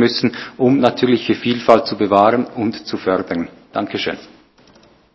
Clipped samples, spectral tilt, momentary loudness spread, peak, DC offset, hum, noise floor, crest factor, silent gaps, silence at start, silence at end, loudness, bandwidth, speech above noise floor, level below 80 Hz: 0.1%; -6.5 dB/octave; 11 LU; 0 dBFS; under 0.1%; none; -49 dBFS; 18 dB; none; 0 s; 0.9 s; -17 LUFS; 8 kHz; 33 dB; -54 dBFS